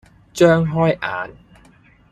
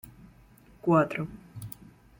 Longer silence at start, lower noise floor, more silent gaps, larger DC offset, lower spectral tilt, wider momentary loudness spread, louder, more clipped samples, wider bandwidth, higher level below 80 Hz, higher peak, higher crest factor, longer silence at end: second, 0.35 s vs 0.85 s; second, -51 dBFS vs -56 dBFS; neither; neither; second, -6.5 dB/octave vs -8 dB/octave; second, 18 LU vs 22 LU; first, -17 LUFS vs -27 LUFS; neither; second, 13.5 kHz vs 16.5 kHz; first, -50 dBFS vs -60 dBFS; first, -2 dBFS vs -10 dBFS; about the same, 18 dB vs 20 dB; first, 0.8 s vs 0.5 s